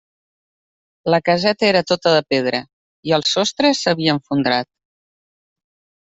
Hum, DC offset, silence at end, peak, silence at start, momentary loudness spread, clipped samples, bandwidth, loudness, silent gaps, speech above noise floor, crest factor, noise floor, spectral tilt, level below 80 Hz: none; under 0.1%; 1.35 s; -2 dBFS; 1.05 s; 8 LU; under 0.1%; 8.2 kHz; -17 LUFS; 2.73-3.03 s; over 73 dB; 18 dB; under -90 dBFS; -4.5 dB/octave; -60 dBFS